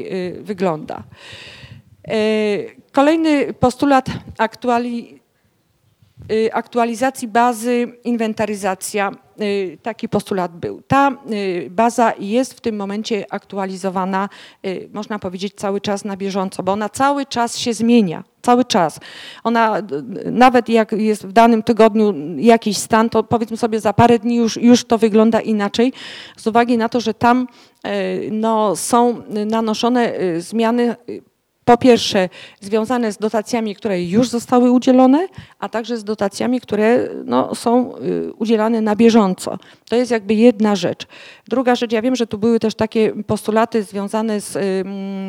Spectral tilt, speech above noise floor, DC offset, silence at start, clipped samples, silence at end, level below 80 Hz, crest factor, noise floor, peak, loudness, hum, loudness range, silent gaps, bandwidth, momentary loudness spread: -5 dB/octave; 45 dB; under 0.1%; 0 s; under 0.1%; 0 s; -54 dBFS; 16 dB; -61 dBFS; 0 dBFS; -17 LUFS; none; 6 LU; none; 16 kHz; 12 LU